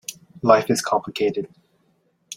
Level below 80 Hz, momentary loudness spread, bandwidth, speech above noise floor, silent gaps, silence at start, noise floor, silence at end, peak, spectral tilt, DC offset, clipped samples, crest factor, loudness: -64 dBFS; 17 LU; 16.5 kHz; 45 dB; none; 0.1 s; -65 dBFS; 0 s; -2 dBFS; -4.5 dB/octave; under 0.1%; under 0.1%; 22 dB; -21 LUFS